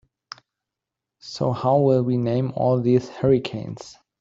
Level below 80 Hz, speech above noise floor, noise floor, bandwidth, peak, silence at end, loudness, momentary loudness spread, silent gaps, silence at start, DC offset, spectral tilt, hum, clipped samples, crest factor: -56 dBFS; 65 dB; -86 dBFS; 7.6 kHz; -6 dBFS; 0.3 s; -21 LUFS; 23 LU; none; 1.25 s; under 0.1%; -8 dB/octave; none; under 0.1%; 16 dB